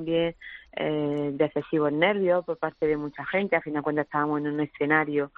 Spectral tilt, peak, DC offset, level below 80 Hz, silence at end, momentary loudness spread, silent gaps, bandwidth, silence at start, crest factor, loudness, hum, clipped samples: -4.5 dB/octave; -8 dBFS; under 0.1%; -60 dBFS; 0.1 s; 7 LU; none; 4.8 kHz; 0 s; 20 dB; -26 LUFS; none; under 0.1%